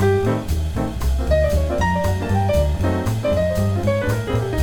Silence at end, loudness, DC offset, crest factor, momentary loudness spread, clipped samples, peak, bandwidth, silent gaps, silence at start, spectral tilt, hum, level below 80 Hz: 0 s; -20 LUFS; under 0.1%; 12 dB; 5 LU; under 0.1%; -6 dBFS; 18.5 kHz; none; 0 s; -7 dB/octave; none; -26 dBFS